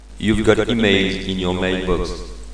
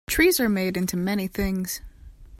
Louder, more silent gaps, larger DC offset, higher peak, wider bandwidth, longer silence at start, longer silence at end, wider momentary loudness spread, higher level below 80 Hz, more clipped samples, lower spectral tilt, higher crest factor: first, -18 LUFS vs -24 LUFS; neither; first, 1% vs under 0.1%; first, 0 dBFS vs -8 dBFS; second, 10.5 kHz vs 16.5 kHz; about the same, 0 s vs 0.1 s; about the same, 0 s vs 0.05 s; second, 7 LU vs 11 LU; first, -32 dBFS vs -40 dBFS; neither; about the same, -5.5 dB/octave vs -4.5 dB/octave; about the same, 18 dB vs 18 dB